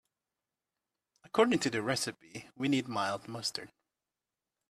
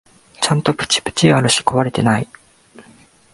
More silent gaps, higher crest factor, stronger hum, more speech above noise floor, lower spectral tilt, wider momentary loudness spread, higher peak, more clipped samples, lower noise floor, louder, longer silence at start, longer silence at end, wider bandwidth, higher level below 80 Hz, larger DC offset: neither; first, 24 dB vs 18 dB; neither; first, over 57 dB vs 32 dB; about the same, -4 dB/octave vs -4 dB/octave; first, 12 LU vs 7 LU; second, -12 dBFS vs 0 dBFS; neither; first, under -90 dBFS vs -48 dBFS; second, -32 LUFS vs -16 LUFS; first, 1.35 s vs 0.4 s; first, 1.05 s vs 0.5 s; first, 14.5 kHz vs 11.5 kHz; second, -74 dBFS vs -48 dBFS; neither